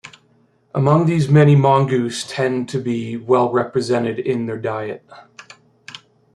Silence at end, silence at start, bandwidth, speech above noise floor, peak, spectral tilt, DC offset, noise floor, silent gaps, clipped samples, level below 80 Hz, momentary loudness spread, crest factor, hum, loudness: 0.4 s; 0.05 s; 11 kHz; 41 dB; -2 dBFS; -7 dB/octave; under 0.1%; -57 dBFS; none; under 0.1%; -58 dBFS; 15 LU; 16 dB; none; -18 LUFS